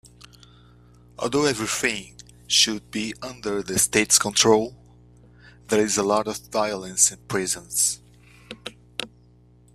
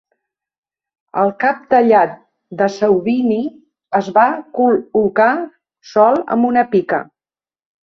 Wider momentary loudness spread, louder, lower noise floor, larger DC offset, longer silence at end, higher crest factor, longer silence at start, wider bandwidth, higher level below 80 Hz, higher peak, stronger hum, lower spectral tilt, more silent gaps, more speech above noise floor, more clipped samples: first, 16 LU vs 8 LU; second, -21 LUFS vs -15 LUFS; second, -54 dBFS vs under -90 dBFS; neither; about the same, 0.7 s vs 0.8 s; first, 24 dB vs 14 dB; about the same, 1.2 s vs 1.15 s; first, 15.5 kHz vs 6.6 kHz; first, -54 dBFS vs -60 dBFS; about the same, -2 dBFS vs -2 dBFS; first, 60 Hz at -50 dBFS vs none; second, -2 dB/octave vs -7 dB/octave; neither; second, 31 dB vs over 76 dB; neither